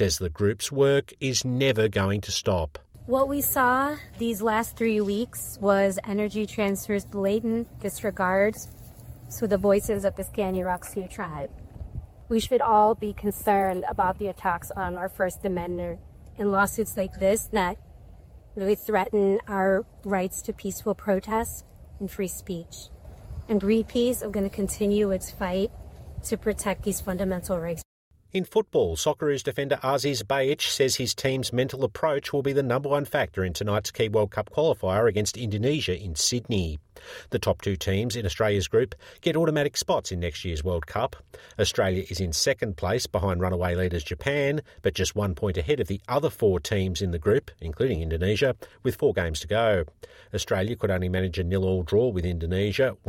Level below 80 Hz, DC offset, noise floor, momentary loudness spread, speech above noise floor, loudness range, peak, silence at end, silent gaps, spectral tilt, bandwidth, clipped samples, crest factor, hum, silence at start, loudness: -46 dBFS; under 0.1%; -48 dBFS; 10 LU; 22 dB; 3 LU; -8 dBFS; 0.15 s; 27.85-28.11 s; -5 dB/octave; 17 kHz; under 0.1%; 18 dB; none; 0 s; -26 LUFS